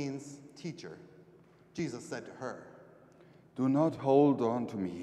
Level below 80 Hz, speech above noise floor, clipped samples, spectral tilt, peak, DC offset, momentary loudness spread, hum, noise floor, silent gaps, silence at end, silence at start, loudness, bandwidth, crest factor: -76 dBFS; 29 dB; under 0.1%; -7.5 dB/octave; -12 dBFS; under 0.1%; 22 LU; none; -60 dBFS; none; 0 s; 0 s; -32 LUFS; 10 kHz; 20 dB